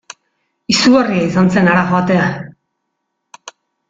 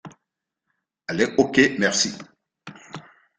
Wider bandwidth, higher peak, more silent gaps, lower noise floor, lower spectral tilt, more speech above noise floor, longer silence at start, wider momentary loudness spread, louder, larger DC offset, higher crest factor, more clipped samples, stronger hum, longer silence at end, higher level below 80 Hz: second, 7.8 kHz vs 9.6 kHz; about the same, -2 dBFS vs -2 dBFS; neither; second, -72 dBFS vs -82 dBFS; first, -5.5 dB/octave vs -3 dB/octave; about the same, 60 dB vs 62 dB; first, 0.7 s vs 0.05 s; second, 17 LU vs 23 LU; first, -13 LUFS vs -20 LUFS; neither; second, 14 dB vs 22 dB; neither; neither; about the same, 0.4 s vs 0.4 s; first, -50 dBFS vs -60 dBFS